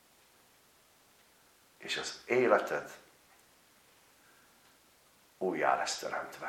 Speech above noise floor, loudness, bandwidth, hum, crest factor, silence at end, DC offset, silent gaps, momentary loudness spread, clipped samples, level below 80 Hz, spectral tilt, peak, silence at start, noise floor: 33 dB; -32 LUFS; 17 kHz; none; 26 dB; 0 s; under 0.1%; none; 17 LU; under 0.1%; -78 dBFS; -3 dB/octave; -12 dBFS; 1.8 s; -65 dBFS